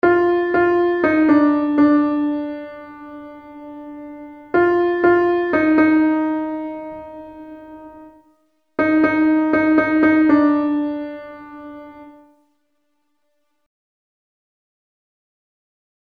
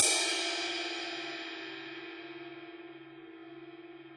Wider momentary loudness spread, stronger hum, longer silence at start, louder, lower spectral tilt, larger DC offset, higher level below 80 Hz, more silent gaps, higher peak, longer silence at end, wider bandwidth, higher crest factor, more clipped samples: about the same, 22 LU vs 20 LU; neither; about the same, 0.05 s vs 0 s; first, -16 LUFS vs -34 LUFS; first, -8 dB/octave vs 0.5 dB/octave; neither; first, -54 dBFS vs -84 dBFS; neither; first, -2 dBFS vs -6 dBFS; first, 3.95 s vs 0 s; second, 5 kHz vs 11.5 kHz; second, 16 dB vs 30 dB; neither